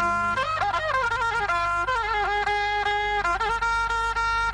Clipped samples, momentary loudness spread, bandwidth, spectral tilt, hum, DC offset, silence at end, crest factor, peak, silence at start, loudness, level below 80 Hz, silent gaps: under 0.1%; 1 LU; 11 kHz; -3 dB/octave; 50 Hz at -40 dBFS; under 0.1%; 0 s; 12 dB; -14 dBFS; 0 s; -24 LUFS; -42 dBFS; none